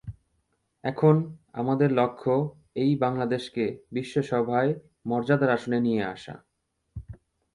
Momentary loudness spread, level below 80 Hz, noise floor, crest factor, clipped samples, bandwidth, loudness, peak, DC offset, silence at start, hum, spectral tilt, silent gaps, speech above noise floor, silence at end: 17 LU; -56 dBFS; -73 dBFS; 20 dB; under 0.1%; 11 kHz; -26 LUFS; -6 dBFS; under 0.1%; 0.05 s; none; -8 dB/octave; none; 48 dB; 0.4 s